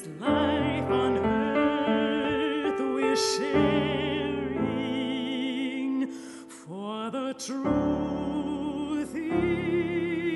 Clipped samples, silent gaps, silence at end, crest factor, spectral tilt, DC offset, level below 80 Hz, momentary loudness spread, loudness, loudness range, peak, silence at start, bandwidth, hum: under 0.1%; none; 0 s; 16 dB; -5 dB/octave; under 0.1%; -52 dBFS; 8 LU; -28 LUFS; 5 LU; -12 dBFS; 0 s; 11.5 kHz; none